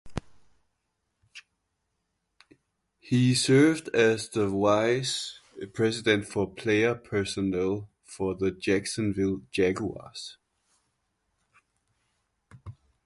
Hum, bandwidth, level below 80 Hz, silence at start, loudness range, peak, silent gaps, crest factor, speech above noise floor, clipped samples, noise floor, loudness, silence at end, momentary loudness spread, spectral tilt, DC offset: none; 11.5 kHz; -56 dBFS; 0.05 s; 9 LU; -8 dBFS; none; 20 dB; 53 dB; under 0.1%; -79 dBFS; -26 LUFS; 0.35 s; 17 LU; -5 dB/octave; under 0.1%